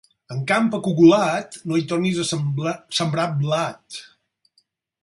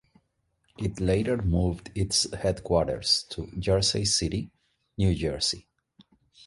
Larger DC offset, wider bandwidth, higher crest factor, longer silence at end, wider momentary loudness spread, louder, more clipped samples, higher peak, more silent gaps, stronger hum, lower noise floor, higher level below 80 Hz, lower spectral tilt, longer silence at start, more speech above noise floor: neither; about the same, 11.5 kHz vs 11.5 kHz; about the same, 18 dB vs 18 dB; first, 1 s vs 0.85 s; first, 15 LU vs 11 LU; first, -20 LUFS vs -27 LUFS; neither; first, -2 dBFS vs -10 dBFS; neither; neither; second, -66 dBFS vs -73 dBFS; second, -64 dBFS vs -40 dBFS; about the same, -5.5 dB/octave vs -4.5 dB/octave; second, 0.3 s vs 0.8 s; about the same, 46 dB vs 47 dB